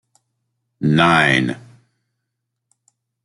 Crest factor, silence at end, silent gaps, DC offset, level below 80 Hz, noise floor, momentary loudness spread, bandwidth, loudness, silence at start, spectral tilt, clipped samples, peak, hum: 20 dB; 1.65 s; none; under 0.1%; -54 dBFS; -78 dBFS; 12 LU; 11.5 kHz; -15 LUFS; 0.8 s; -5.5 dB/octave; under 0.1%; 0 dBFS; none